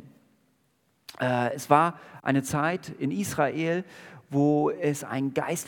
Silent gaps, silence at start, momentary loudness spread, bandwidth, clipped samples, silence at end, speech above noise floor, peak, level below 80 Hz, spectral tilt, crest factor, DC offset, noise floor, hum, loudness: none; 0.05 s; 9 LU; 18 kHz; under 0.1%; 0 s; 43 dB; -4 dBFS; -68 dBFS; -5.5 dB/octave; 24 dB; under 0.1%; -70 dBFS; none; -27 LUFS